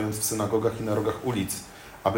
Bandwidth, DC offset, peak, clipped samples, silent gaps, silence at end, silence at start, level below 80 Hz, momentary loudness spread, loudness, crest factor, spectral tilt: 16.5 kHz; under 0.1%; -8 dBFS; under 0.1%; none; 0 s; 0 s; -54 dBFS; 7 LU; -28 LUFS; 20 dB; -5 dB/octave